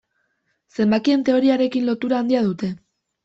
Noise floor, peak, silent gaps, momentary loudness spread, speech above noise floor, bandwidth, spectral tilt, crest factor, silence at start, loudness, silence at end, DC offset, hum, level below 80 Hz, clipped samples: -70 dBFS; -6 dBFS; none; 11 LU; 52 dB; 7.8 kHz; -7 dB/octave; 14 dB; 0.8 s; -20 LUFS; 0.5 s; under 0.1%; none; -62 dBFS; under 0.1%